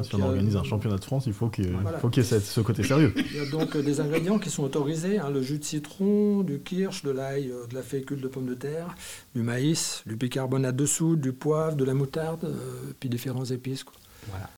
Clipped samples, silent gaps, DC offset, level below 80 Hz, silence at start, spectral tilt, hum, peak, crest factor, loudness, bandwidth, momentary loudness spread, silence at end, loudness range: under 0.1%; none; 0.1%; -58 dBFS; 0 s; -6 dB/octave; none; -10 dBFS; 16 dB; -28 LUFS; 18 kHz; 10 LU; 0 s; 5 LU